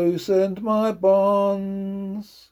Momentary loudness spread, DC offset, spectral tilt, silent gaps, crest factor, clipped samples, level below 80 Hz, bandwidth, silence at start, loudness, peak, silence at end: 12 LU; under 0.1%; -7.5 dB/octave; none; 14 dB; under 0.1%; -62 dBFS; 19.5 kHz; 0 s; -21 LUFS; -6 dBFS; 0.3 s